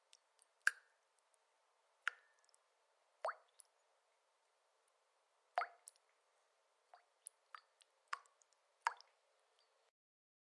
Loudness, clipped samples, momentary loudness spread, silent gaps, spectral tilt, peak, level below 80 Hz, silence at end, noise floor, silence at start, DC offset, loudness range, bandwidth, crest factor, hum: -46 LUFS; under 0.1%; 23 LU; none; 4.5 dB/octave; -18 dBFS; under -90 dBFS; 1.55 s; -81 dBFS; 0.65 s; under 0.1%; 6 LU; 11 kHz; 34 dB; none